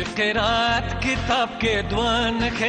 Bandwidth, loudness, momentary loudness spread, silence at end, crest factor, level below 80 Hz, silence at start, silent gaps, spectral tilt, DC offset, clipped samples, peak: 9.4 kHz; -21 LUFS; 3 LU; 0 s; 14 dB; -36 dBFS; 0 s; none; -4.5 dB/octave; under 0.1%; under 0.1%; -8 dBFS